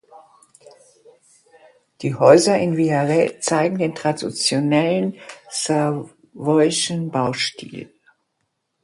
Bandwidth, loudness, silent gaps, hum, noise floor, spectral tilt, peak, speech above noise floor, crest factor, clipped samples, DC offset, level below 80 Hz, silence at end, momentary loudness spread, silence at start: 11.5 kHz; -19 LUFS; none; none; -73 dBFS; -4.5 dB/octave; 0 dBFS; 55 dB; 20 dB; under 0.1%; under 0.1%; -64 dBFS; 1 s; 15 LU; 2 s